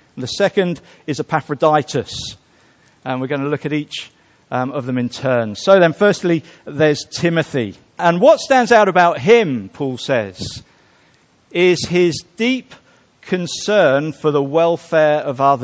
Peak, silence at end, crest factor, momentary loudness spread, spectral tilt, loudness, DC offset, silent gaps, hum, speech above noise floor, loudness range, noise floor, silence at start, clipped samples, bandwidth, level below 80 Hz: 0 dBFS; 0 s; 16 dB; 14 LU; -5.5 dB/octave; -16 LUFS; under 0.1%; none; none; 38 dB; 7 LU; -54 dBFS; 0.15 s; under 0.1%; 8 kHz; -54 dBFS